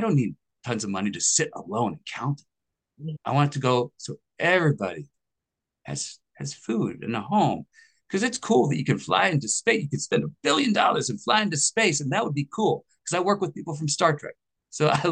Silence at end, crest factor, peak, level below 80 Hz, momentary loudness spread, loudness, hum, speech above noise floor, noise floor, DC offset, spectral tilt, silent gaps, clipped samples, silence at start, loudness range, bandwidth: 0 s; 20 dB; -4 dBFS; -68 dBFS; 13 LU; -25 LUFS; none; 61 dB; -86 dBFS; under 0.1%; -4 dB/octave; none; under 0.1%; 0 s; 5 LU; 10 kHz